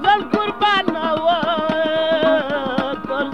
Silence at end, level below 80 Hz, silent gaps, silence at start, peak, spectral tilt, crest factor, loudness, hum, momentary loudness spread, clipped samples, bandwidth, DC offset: 0 s; -52 dBFS; none; 0 s; -2 dBFS; -5.5 dB/octave; 16 dB; -18 LUFS; none; 5 LU; under 0.1%; 10 kHz; 0.7%